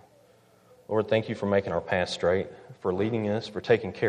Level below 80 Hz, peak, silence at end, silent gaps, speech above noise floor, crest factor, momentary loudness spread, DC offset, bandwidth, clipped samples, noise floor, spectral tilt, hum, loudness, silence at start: -60 dBFS; -8 dBFS; 0 s; none; 32 dB; 20 dB; 6 LU; under 0.1%; 10.5 kHz; under 0.1%; -59 dBFS; -6.5 dB/octave; none; -28 LUFS; 0.9 s